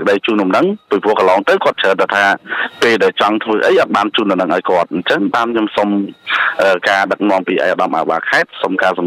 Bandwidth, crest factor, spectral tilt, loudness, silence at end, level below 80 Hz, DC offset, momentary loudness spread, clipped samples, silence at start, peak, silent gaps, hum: 14.5 kHz; 12 dB; -5 dB/octave; -14 LUFS; 0 s; -62 dBFS; under 0.1%; 4 LU; under 0.1%; 0 s; -2 dBFS; none; none